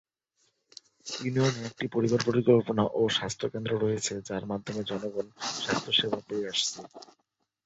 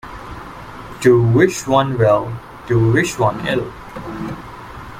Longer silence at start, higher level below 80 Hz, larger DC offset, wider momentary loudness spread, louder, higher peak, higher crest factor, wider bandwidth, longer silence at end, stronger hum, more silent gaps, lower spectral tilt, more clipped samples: first, 1.05 s vs 0.05 s; second, -64 dBFS vs -42 dBFS; neither; second, 11 LU vs 20 LU; second, -29 LUFS vs -16 LUFS; second, -10 dBFS vs 0 dBFS; about the same, 20 dB vs 16 dB; second, 8.2 kHz vs 15.5 kHz; first, 0.6 s vs 0 s; neither; neither; second, -4.5 dB/octave vs -6.5 dB/octave; neither